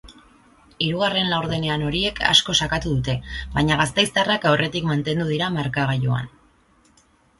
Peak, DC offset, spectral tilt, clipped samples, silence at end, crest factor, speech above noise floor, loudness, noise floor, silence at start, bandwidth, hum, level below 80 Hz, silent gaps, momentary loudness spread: 0 dBFS; under 0.1%; -4.5 dB/octave; under 0.1%; 1.1 s; 22 dB; 37 dB; -21 LUFS; -58 dBFS; 0.05 s; 11.5 kHz; none; -42 dBFS; none; 9 LU